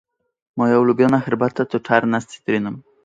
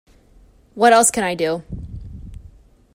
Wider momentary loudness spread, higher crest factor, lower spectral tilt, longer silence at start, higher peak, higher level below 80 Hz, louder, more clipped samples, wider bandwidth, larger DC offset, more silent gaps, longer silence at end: second, 8 LU vs 24 LU; about the same, 18 dB vs 20 dB; first, -7 dB/octave vs -3 dB/octave; second, 0.55 s vs 0.75 s; about the same, 0 dBFS vs -2 dBFS; second, -60 dBFS vs -42 dBFS; about the same, -18 LUFS vs -16 LUFS; neither; second, 9 kHz vs 16 kHz; neither; neither; second, 0.25 s vs 0.55 s